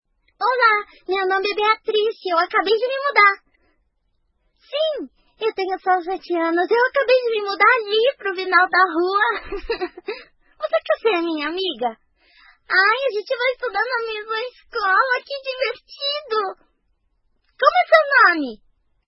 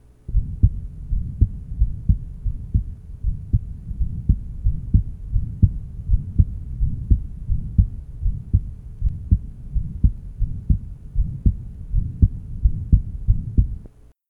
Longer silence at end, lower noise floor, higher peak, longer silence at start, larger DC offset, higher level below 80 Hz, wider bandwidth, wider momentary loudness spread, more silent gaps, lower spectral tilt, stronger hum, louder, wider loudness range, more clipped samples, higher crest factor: about the same, 0.5 s vs 0.4 s; first, -68 dBFS vs -44 dBFS; about the same, 0 dBFS vs 0 dBFS; about the same, 0.4 s vs 0.3 s; neither; second, -54 dBFS vs -24 dBFS; first, 6 kHz vs 0.8 kHz; first, 13 LU vs 9 LU; neither; second, -4.5 dB/octave vs -12 dB/octave; neither; first, -19 LUFS vs -25 LUFS; first, 5 LU vs 2 LU; neither; about the same, 20 dB vs 20 dB